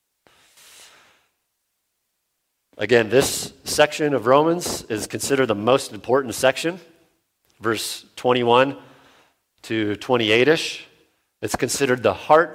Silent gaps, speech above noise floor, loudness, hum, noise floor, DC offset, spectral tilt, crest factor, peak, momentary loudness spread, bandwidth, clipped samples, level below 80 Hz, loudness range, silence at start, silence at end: none; 55 dB; -20 LUFS; none; -75 dBFS; under 0.1%; -3.5 dB/octave; 22 dB; 0 dBFS; 12 LU; 16.5 kHz; under 0.1%; -56 dBFS; 4 LU; 2.8 s; 0 s